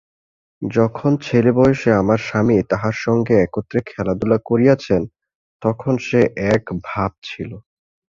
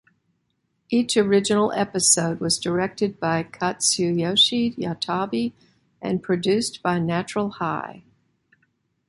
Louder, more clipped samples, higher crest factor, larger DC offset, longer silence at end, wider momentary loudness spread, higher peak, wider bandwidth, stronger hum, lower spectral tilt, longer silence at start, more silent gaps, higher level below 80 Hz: first, -18 LUFS vs -22 LUFS; neither; about the same, 16 dB vs 20 dB; neither; second, 0.55 s vs 1.1 s; about the same, 10 LU vs 10 LU; about the same, -2 dBFS vs -4 dBFS; second, 7.4 kHz vs 12 kHz; neither; first, -7.5 dB/octave vs -3.5 dB/octave; second, 0.6 s vs 0.9 s; first, 5.35-5.60 s, 7.18-7.22 s vs none; first, -46 dBFS vs -60 dBFS